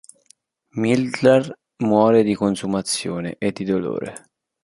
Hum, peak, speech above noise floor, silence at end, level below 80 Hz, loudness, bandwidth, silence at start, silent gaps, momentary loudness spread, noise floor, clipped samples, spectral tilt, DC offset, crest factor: none; -2 dBFS; 38 dB; 0.45 s; -56 dBFS; -20 LUFS; 11.5 kHz; 0.75 s; none; 12 LU; -57 dBFS; under 0.1%; -5.5 dB/octave; under 0.1%; 18 dB